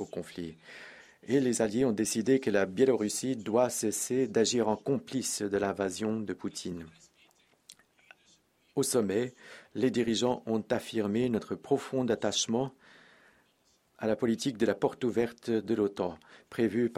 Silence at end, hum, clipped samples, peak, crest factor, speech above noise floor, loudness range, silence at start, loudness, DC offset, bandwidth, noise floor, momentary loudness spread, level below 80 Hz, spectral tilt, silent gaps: 0 s; none; under 0.1%; -12 dBFS; 18 dB; 40 dB; 7 LU; 0 s; -30 LUFS; under 0.1%; 16 kHz; -70 dBFS; 14 LU; -68 dBFS; -4.5 dB/octave; none